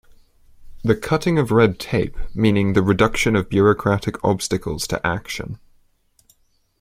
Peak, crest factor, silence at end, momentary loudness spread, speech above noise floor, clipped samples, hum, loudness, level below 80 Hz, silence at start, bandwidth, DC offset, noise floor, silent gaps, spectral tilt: 0 dBFS; 20 dB; 1.25 s; 10 LU; 42 dB; under 0.1%; none; -19 LUFS; -38 dBFS; 0.6 s; 16 kHz; under 0.1%; -61 dBFS; none; -6 dB/octave